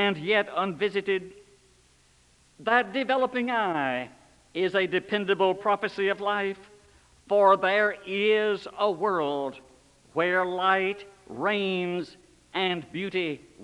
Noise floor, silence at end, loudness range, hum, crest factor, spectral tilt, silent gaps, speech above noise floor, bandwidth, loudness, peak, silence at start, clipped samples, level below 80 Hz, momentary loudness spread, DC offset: -61 dBFS; 0 s; 3 LU; none; 20 dB; -5.5 dB/octave; none; 35 dB; 11 kHz; -26 LUFS; -8 dBFS; 0 s; under 0.1%; -68 dBFS; 11 LU; under 0.1%